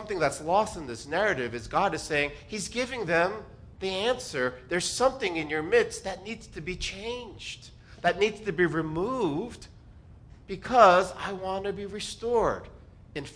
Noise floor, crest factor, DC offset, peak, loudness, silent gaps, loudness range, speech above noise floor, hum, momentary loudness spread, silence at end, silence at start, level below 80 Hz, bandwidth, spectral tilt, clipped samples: -50 dBFS; 24 dB; under 0.1%; -4 dBFS; -28 LUFS; none; 4 LU; 23 dB; none; 13 LU; 0 s; 0 s; -52 dBFS; 10.5 kHz; -4 dB/octave; under 0.1%